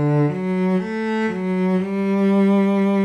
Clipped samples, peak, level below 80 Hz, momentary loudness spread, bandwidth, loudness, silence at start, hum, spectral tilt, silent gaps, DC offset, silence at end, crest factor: under 0.1%; -8 dBFS; -60 dBFS; 6 LU; 8.2 kHz; -19 LUFS; 0 s; none; -9 dB/octave; none; under 0.1%; 0 s; 10 dB